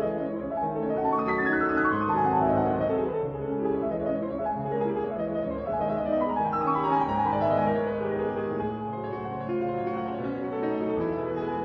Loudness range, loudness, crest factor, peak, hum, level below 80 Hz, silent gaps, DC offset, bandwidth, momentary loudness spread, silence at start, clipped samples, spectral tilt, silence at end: 4 LU; -27 LUFS; 14 dB; -12 dBFS; none; -52 dBFS; none; under 0.1%; 6 kHz; 7 LU; 0 s; under 0.1%; -9.5 dB/octave; 0 s